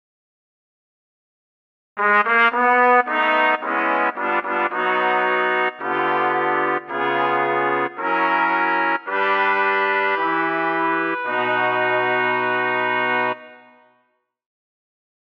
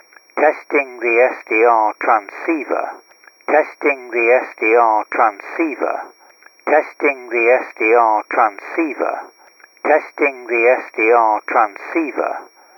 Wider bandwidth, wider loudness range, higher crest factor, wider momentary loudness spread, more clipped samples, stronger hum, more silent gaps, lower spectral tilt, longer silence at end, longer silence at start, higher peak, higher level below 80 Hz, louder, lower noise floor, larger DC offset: second, 6.6 kHz vs 18 kHz; about the same, 3 LU vs 1 LU; about the same, 16 dB vs 16 dB; second, 6 LU vs 9 LU; neither; neither; neither; first, -6 dB/octave vs -4.5 dB/octave; first, 1.75 s vs 0.35 s; first, 1.95 s vs 0.35 s; about the same, -4 dBFS vs -2 dBFS; first, -74 dBFS vs under -90 dBFS; second, -19 LUFS vs -16 LUFS; first, -67 dBFS vs -37 dBFS; neither